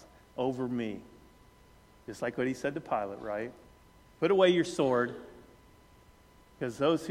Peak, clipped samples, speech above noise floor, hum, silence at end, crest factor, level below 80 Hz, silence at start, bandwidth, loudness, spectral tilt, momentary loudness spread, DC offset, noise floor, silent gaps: -12 dBFS; under 0.1%; 29 dB; none; 0 s; 22 dB; -64 dBFS; 0 s; 14.5 kHz; -31 LUFS; -5.5 dB/octave; 21 LU; under 0.1%; -59 dBFS; none